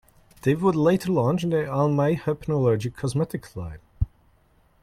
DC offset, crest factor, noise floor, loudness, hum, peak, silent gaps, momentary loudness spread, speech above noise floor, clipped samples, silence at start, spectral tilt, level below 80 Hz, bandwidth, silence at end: under 0.1%; 16 dB; -61 dBFS; -24 LUFS; none; -8 dBFS; none; 11 LU; 38 dB; under 0.1%; 0.45 s; -7.5 dB/octave; -44 dBFS; 15 kHz; 0.75 s